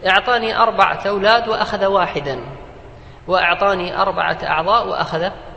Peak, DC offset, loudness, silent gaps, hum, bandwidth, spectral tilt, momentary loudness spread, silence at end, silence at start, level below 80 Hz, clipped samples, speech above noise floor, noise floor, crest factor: 0 dBFS; under 0.1%; -17 LUFS; none; none; 8.6 kHz; -5 dB/octave; 10 LU; 0 s; 0 s; -42 dBFS; under 0.1%; 21 dB; -38 dBFS; 18 dB